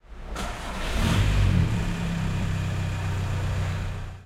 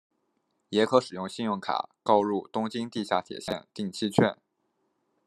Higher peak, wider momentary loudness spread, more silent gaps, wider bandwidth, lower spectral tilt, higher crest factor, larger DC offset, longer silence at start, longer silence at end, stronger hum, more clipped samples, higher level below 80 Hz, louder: second, -10 dBFS vs -4 dBFS; about the same, 10 LU vs 11 LU; neither; about the same, 14 kHz vs 13 kHz; about the same, -6 dB/octave vs -5.5 dB/octave; second, 16 dB vs 24 dB; neither; second, 0.1 s vs 0.7 s; second, 0 s vs 0.95 s; neither; neither; first, -32 dBFS vs -68 dBFS; about the same, -27 LUFS vs -28 LUFS